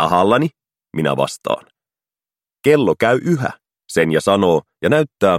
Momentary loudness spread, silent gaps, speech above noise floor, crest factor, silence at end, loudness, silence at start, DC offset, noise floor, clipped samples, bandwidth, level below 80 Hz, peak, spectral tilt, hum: 9 LU; none; over 74 dB; 18 dB; 0 s; -17 LUFS; 0 s; under 0.1%; under -90 dBFS; under 0.1%; 16 kHz; -54 dBFS; 0 dBFS; -6 dB/octave; none